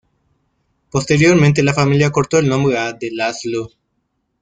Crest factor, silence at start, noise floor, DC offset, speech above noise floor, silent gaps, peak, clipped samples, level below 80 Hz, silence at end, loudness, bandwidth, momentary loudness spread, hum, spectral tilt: 14 dB; 0.95 s; -69 dBFS; under 0.1%; 54 dB; none; -2 dBFS; under 0.1%; -48 dBFS; 0.75 s; -15 LUFS; 9.2 kHz; 12 LU; none; -6 dB/octave